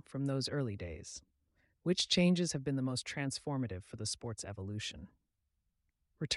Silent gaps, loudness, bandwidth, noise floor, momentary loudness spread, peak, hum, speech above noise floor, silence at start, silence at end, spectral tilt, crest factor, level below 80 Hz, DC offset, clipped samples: none; -36 LUFS; 11.5 kHz; -83 dBFS; 15 LU; -18 dBFS; none; 47 dB; 0.1 s; 0 s; -4.5 dB/octave; 20 dB; -64 dBFS; under 0.1%; under 0.1%